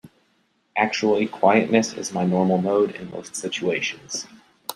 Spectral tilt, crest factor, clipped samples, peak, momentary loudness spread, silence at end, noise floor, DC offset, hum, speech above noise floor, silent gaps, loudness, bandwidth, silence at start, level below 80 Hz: -4.5 dB/octave; 20 dB; under 0.1%; -2 dBFS; 13 LU; 0.05 s; -66 dBFS; under 0.1%; none; 44 dB; none; -22 LUFS; 14 kHz; 0.05 s; -66 dBFS